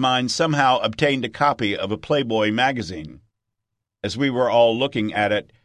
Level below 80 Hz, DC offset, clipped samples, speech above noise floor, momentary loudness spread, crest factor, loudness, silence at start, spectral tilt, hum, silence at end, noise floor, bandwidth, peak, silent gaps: -52 dBFS; under 0.1%; under 0.1%; 61 dB; 12 LU; 20 dB; -20 LUFS; 0 s; -5 dB/octave; none; 0.2 s; -81 dBFS; 11 kHz; -2 dBFS; none